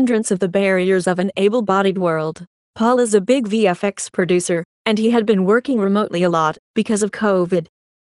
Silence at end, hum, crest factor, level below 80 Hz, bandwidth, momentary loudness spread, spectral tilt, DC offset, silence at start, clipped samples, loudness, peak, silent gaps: 0.35 s; none; 16 dB; -62 dBFS; 11.5 kHz; 6 LU; -5.5 dB/octave; under 0.1%; 0 s; under 0.1%; -17 LUFS; -2 dBFS; 2.47-2.74 s, 4.65-4.85 s, 6.59-6.74 s